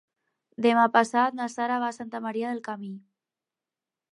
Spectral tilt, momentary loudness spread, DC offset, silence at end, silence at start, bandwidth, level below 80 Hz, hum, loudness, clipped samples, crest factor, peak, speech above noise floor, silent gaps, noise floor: -4.5 dB/octave; 16 LU; under 0.1%; 1.15 s; 0.6 s; 11 kHz; -82 dBFS; none; -26 LUFS; under 0.1%; 22 dB; -6 dBFS; 64 dB; none; -90 dBFS